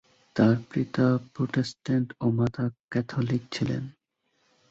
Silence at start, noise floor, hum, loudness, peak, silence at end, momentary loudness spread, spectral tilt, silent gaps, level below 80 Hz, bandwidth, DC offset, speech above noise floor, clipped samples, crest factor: 0.35 s; -73 dBFS; none; -27 LUFS; -8 dBFS; 0.8 s; 9 LU; -7.5 dB/octave; 2.80-2.88 s; -58 dBFS; 8 kHz; under 0.1%; 47 dB; under 0.1%; 18 dB